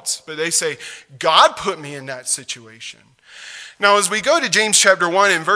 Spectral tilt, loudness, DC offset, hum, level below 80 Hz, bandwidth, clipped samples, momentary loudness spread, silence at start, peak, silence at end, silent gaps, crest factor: -1 dB/octave; -15 LUFS; under 0.1%; none; -62 dBFS; 11 kHz; under 0.1%; 22 LU; 0.05 s; 0 dBFS; 0 s; none; 18 dB